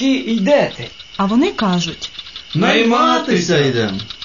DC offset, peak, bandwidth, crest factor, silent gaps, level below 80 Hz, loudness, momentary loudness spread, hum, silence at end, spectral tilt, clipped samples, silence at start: 0.4%; -2 dBFS; 7.4 kHz; 14 dB; none; -50 dBFS; -15 LUFS; 15 LU; none; 0 s; -5 dB/octave; under 0.1%; 0 s